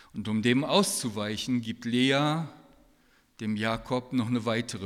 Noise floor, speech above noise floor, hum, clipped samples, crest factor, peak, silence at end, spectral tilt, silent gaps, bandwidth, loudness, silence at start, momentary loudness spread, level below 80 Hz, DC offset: -64 dBFS; 36 dB; none; under 0.1%; 20 dB; -8 dBFS; 0 s; -4.5 dB/octave; none; 15.5 kHz; -28 LUFS; 0.15 s; 9 LU; -60 dBFS; under 0.1%